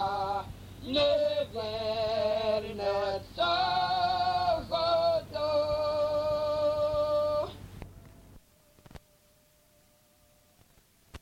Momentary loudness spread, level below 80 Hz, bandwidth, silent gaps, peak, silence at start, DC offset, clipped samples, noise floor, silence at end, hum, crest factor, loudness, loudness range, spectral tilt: 8 LU; -54 dBFS; 16 kHz; none; -14 dBFS; 0 s; under 0.1%; under 0.1%; -64 dBFS; 0.05 s; none; 16 dB; -29 LUFS; 6 LU; -5 dB/octave